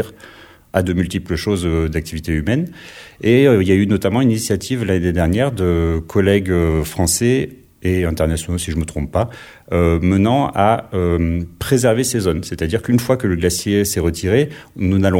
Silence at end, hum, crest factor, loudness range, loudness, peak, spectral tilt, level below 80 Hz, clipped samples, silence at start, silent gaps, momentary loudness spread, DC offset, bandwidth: 0 s; none; 16 dB; 3 LU; -17 LUFS; -2 dBFS; -6 dB/octave; -32 dBFS; under 0.1%; 0 s; none; 8 LU; under 0.1%; 17 kHz